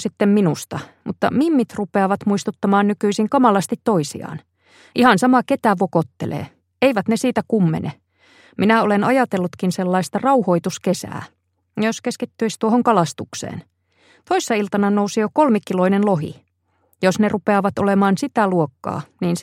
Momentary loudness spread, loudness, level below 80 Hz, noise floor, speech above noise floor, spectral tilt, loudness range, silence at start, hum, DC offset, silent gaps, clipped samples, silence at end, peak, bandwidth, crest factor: 13 LU; -19 LUFS; -62 dBFS; -64 dBFS; 46 dB; -6 dB/octave; 3 LU; 0 s; none; under 0.1%; none; under 0.1%; 0 s; 0 dBFS; 15 kHz; 18 dB